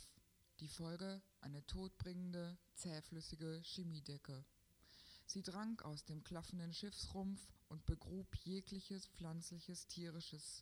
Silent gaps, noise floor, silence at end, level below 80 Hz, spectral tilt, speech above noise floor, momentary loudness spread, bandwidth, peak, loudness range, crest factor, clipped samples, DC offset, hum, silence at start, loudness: none; -74 dBFS; 0 s; -62 dBFS; -5 dB/octave; 23 dB; 9 LU; over 20 kHz; -28 dBFS; 2 LU; 24 dB; under 0.1%; under 0.1%; none; 0 s; -51 LUFS